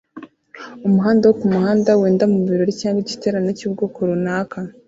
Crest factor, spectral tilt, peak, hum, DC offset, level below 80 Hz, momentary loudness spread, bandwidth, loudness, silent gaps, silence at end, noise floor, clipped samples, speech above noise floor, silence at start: 16 dB; -7 dB/octave; -2 dBFS; none; under 0.1%; -58 dBFS; 9 LU; 7.8 kHz; -18 LUFS; none; 0.15 s; -40 dBFS; under 0.1%; 23 dB; 0.15 s